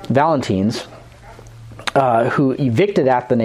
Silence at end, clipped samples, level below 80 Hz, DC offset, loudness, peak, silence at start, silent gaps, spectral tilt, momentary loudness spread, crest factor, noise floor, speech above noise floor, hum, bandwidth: 0 s; under 0.1%; -50 dBFS; under 0.1%; -17 LUFS; -2 dBFS; 0 s; none; -7 dB/octave; 10 LU; 16 dB; -40 dBFS; 24 dB; none; 14.5 kHz